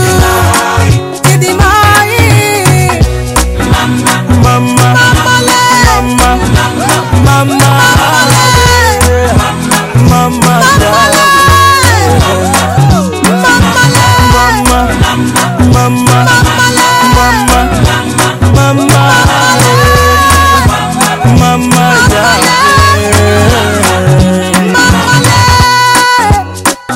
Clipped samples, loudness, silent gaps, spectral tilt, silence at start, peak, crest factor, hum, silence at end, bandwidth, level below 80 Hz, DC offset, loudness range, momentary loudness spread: 3%; -6 LUFS; none; -4 dB/octave; 0 s; 0 dBFS; 6 dB; none; 0 s; 17 kHz; -18 dBFS; under 0.1%; 1 LU; 4 LU